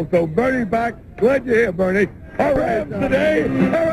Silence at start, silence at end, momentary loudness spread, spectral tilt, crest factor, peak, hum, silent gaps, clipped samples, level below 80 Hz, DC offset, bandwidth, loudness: 0 s; 0 s; 5 LU; -7.5 dB/octave; 14 dB; -4 dBFS; none; none; under 0.1%; -40 dBFS; under 0.1%; 13 kHz; -18 LUFS